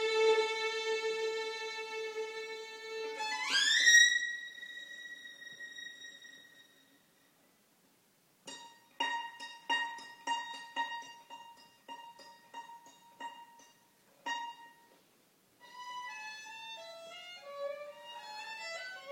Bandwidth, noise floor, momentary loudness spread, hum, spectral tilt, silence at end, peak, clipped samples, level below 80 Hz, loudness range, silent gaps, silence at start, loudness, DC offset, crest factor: 16.5 kHz; -70 dBFS; 22 LU; none; 2 dB/octave; 0 s; -12 dBFS; under 0.1%; under -90 dBFS; 21 LU; none; 0 s; -33 LUFS; under 0.1%; 26 dB